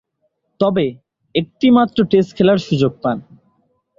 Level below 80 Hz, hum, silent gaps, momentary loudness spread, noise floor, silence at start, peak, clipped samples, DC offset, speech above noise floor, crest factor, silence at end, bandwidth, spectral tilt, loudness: -54 dBFS; none; none; 9 LU; -68 dBFS; 0.6 s; -2 dBFS; under 0.1%; under 0.1%; 53 dB; 14 dB; 0.8 s; 7.4 kHz; -7.5 dB/octave; -16 LUFS